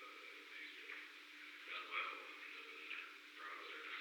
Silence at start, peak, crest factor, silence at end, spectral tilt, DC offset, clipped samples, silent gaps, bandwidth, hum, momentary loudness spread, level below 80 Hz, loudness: 0 s; -30 dBFS; 22 dB; 0 s; 1.5 dB/octave; under 0.1%; under 0.1%; none; 19 kHz; none; 10 LU; under -90 dBFS; -50 LUFS